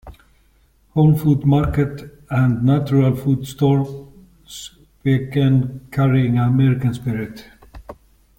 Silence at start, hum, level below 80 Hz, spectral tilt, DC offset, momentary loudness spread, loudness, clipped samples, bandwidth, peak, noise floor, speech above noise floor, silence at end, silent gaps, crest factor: 0.05 s; none; -42 dBFS; -8.5 dB/octave; under 0.1%; 18 LU; -18 LUFS; under 0.1%; 17 kHz; -4 dBFS; -56 dBFS; 39 dB; 0.45 s; none; 16 dB